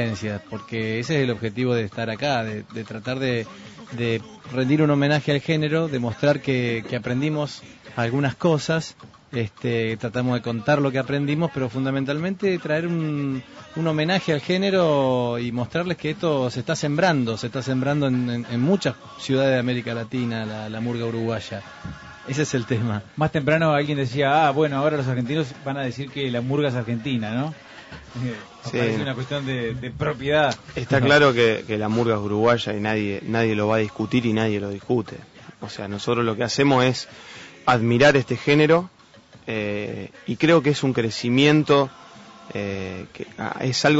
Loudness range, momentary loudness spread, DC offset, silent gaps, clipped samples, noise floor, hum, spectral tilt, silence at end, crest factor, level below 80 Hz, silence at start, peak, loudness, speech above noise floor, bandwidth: 6 LU; 13 LU; under 0.1%; none; under 0.1%; -49 dBFS; none; -6 dB/octave; 0 s; 16 dB; -56 dBFS; 0 s; -6 dBFS; -23 LUFS; 27 dB; 8 kHz